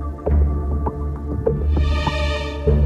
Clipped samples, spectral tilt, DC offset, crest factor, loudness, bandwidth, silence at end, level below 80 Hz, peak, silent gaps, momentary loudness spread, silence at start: under 0.1%; -7.5 dB/octave; under 0.1%; 14 dB; -21 LUFS; 7.4 kHz; 0 s; -22 dBFS; -4 dBFS; none; 5 LU; 0 s